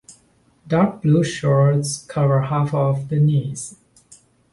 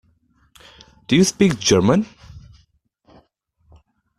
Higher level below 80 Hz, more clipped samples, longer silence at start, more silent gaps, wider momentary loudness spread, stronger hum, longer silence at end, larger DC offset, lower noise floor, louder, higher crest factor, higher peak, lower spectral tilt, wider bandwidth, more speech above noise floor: about the same, -54 dBFS vs -50 dBFS; neither; second, 0.1 s vs 1.1 s; neither; about the same, 8 LU vs 6 LU; neither; second, 0.8 s vs 1.8 s; neither; second, -58 dBFS vs -63 dBFS; about the same, -19 LUFS vs -17 LUFS; second, 14 dB vs 20 dB; second, -6 dBFS vs -2 dBFS; first, -7 dB/octave vs -5 dB/octave; second, 11.5 kHz vs 14.5 kHz; second, 40 dB vs 47 dB